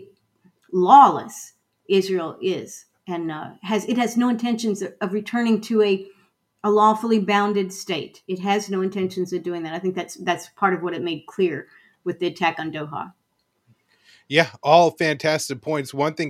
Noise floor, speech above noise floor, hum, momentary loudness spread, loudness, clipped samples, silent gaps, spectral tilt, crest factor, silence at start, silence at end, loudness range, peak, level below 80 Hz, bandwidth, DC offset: -69 dBFS; 48 dB; none; 14 LU; -21 LUFS; under 0.1%; none; -5 dB/octave; 22 dB; 0 s; 0 s; 6 LU; 0 dBFS; -72 dBFS; 15.5 kHz; under 0.1%